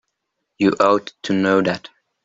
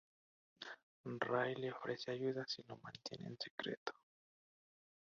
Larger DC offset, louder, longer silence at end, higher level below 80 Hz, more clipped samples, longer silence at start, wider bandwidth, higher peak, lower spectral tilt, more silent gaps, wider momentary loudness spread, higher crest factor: neither; first, -18 LUFS vs -45 LUFS; second, 0.45 s vs 1.2 s; first, -60 dBFS vs -84 dBFS; neither; about the same, 0.6 s vs 0.6 s; about the same, 7.8 kHz vs 7.4 kHz; first, -2 dBFS vs -22 dBFS; first, -6 dB/octave vs -3 dB/octave; second, none vs 0.83-1.04 s, 3.50-3.58 s, 3.77-3.86 s; second, 7 LU vs 14 LU; second, 18 dB vs 24 dB